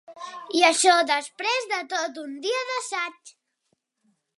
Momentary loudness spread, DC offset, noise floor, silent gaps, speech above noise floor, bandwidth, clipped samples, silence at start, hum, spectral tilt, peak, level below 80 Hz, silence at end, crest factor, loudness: 14 LU; under 0.1%; -74 dBFS; none; 51 dB; 11.5 kHz; under 0.1%; 0.1 s; none; 1 dB/octave; -4 dBFS; -88 dBFS; 1.1 s; 22 dB; -23 LUFS